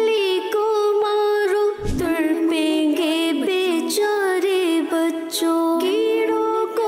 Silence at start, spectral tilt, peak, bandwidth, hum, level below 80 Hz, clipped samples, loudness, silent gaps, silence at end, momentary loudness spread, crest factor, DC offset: 0 s; -4 dB/octave; -12 dBFS; 16 kHz; none; -42 dBFS; under 0.1%; -20 LUFS; none; 0 s; 2 LU; 8 dB; under 0.1%